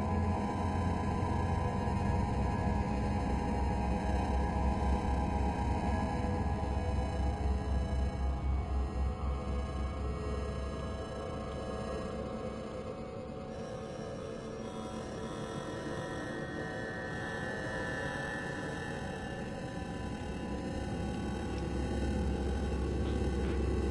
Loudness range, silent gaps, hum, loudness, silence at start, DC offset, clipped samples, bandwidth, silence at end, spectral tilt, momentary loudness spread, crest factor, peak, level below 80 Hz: 7 LU; none; none; -36 LUFS; 0 s; under 0.1%; under 0.1%; 11.5 kHz; 0 s; -7 dB/octave; 8 LU; 14 dB; -20 dBFS; -38 dBFS